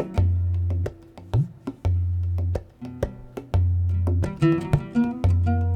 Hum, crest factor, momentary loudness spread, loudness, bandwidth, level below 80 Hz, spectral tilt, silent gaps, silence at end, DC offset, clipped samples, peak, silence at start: none; 18 dB; 10 LU; -25 LUFS; 6 kHz; -34 dBFS; -9 dB/octave; none; 0 s; under 0.1%; under 0.1%; -6 dBFS; 0 s